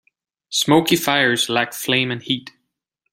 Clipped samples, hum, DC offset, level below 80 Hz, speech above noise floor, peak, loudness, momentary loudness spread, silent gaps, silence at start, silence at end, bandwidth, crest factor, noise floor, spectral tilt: under 0.1%; none; under 0.1%; -60 dBFS; 57 dB; 0 dBFS; -18 LUFS; 8 LU; none; 0.5 s; 0.65 s; 16 kHz; 20 dB; -76 dBFS; -3.5 dB/octave